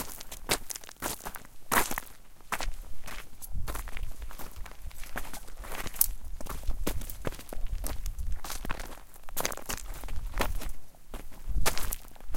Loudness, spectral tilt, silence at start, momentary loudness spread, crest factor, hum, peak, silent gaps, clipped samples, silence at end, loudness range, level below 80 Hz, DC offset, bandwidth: -36 LUFS; -2.5 dB/octave; 0 s; 18 LU; 28 dB; none; -2 dBFS; none; under 0.1%; 0 s; 7 LU; -38 dBFS; under 0.1%; 17 kHz